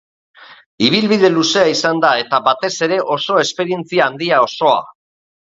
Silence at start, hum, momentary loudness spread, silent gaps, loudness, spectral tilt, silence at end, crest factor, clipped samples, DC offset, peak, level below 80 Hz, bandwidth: 0.4 s; none; 5 LU; 0.66-0.78 s; -14 LUFS; -4 dB/octave; 0.6 s; 16 dB; under 0.1%; under 0.1%; 0 dBFS; -62 dBFS; 7.8 kHz